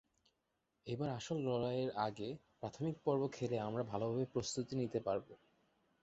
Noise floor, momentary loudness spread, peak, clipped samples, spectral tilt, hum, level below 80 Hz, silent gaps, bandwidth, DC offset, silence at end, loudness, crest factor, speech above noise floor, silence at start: -85 dBFS; 9 LU; -22 dBFS; under 0.1%; -6.5 dB/octave; none; -72 dBFS; none; 8 kHz; under 0.1%; 0.7 s; -41 LUFS; 20 dB; 45 dB; 0.85 s